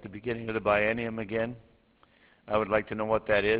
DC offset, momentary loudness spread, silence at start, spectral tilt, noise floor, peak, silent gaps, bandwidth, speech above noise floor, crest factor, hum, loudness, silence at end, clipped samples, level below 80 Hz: under 0.1%; 9 LU; 0 s; -9.5 dB/octave; -63 dBFS; -10 dBFS; none; 4 kHz; 35 dB; 20 dB; none; -29 LUFS; 0 s; under 0.1%; -54 dBFS